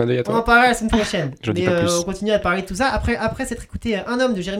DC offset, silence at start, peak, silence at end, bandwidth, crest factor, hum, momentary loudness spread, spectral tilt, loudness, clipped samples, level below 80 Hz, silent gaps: under 0.1%; 0 s; -2 dBFS; 0 s; 16 kHz; 16 dB; none; 10 LU; -4.5 dB/octave; -19 LUFS; under 0.1%; -34 dBFS; none